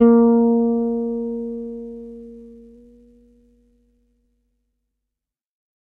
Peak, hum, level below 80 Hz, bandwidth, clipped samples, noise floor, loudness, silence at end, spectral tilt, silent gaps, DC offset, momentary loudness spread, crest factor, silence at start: -2 dBFS; none; -56 dBFS; 2.2 kHz; under 0.1%; -85 dBFS; -19 LUFS; 3.25 s; -11.5 dB/octave; none; under 0.1%; 25 LU; 20 dB; 0 s